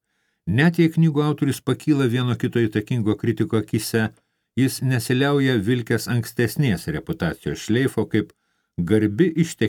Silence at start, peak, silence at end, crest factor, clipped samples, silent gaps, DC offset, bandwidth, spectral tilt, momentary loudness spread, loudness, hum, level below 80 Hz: 0.45 s; -4 dBFS; 0 s; 16 dB; under 0.1%; none; under 0.1%; 19 kHz; -6.5 dB/octave; 8 LU; -21 LUFS; none; -54 dBFS